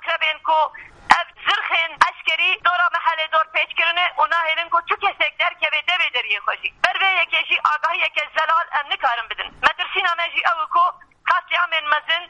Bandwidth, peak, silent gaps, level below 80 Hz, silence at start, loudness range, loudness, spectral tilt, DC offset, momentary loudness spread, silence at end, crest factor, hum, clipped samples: 10.5 kHz; 0 dBFS; none; -58 dBFS; 0 s; 2 LU; -19 LUFS; -0.5 dB/octave; under 0.1%; 4 LU; 0.05 s; 20 dB; none; under 0.1%